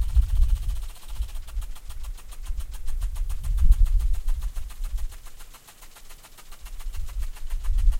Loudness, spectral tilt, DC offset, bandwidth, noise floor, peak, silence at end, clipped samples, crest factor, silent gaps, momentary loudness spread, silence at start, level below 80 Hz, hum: -31 LUFS; -4.5 dB/octave; under 0.1%; 15.5 kHz; -45 dBFS; -6 dBFS; 0 s; under 0.1%; 18 dB; none; 22 LU; 0 s; -24 dBFS; none